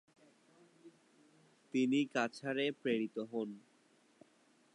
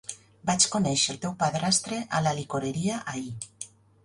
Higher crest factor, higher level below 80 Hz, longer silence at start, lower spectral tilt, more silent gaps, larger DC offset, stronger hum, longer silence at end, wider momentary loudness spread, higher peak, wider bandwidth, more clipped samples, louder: about the same, 22 dB vs 22 dB; second, under -90 dBFS vs -60 dBFS; first, 0.85 s vs 0.1 s; first, -5 dB/octave vs -3.5 dB/octave; neither; neither; neither; first, 1.15 s vs 0.4 s; second, 9 LU vs 16 LU; second, -18 dBFS vs -8 dBFS; about the same, 11 kHz vs 11.5 kHz; neither; second, -37 LUFS vs -26 LUFS